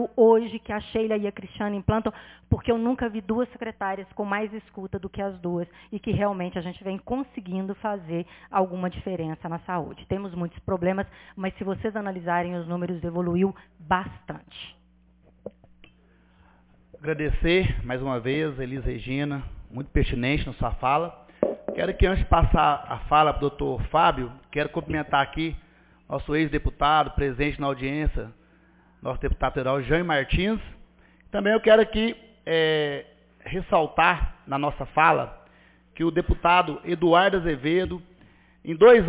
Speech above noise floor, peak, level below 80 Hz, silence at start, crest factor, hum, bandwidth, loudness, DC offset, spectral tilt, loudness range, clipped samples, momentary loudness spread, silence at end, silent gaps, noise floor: 34 dB; -4 dBFS; -36 dBFS; 0 s; 20 dB; none; 4 kHz; -25 LUFS; under 0.1%; -10 dB/octave; 7 LU; under 0.1%; 14 LU; 0 s; none; -59 dBFS